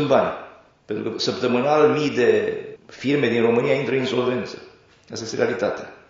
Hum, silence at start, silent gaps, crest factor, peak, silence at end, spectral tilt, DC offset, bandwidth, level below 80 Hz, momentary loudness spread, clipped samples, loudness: none; 0 s; none; 18 dB; -4 dBFS; 0.15 s; -4 dB/octave; under 0.1%; 7.6 kHz; -64 dBFS; 15 LU; under 0.1%; -21 LUFS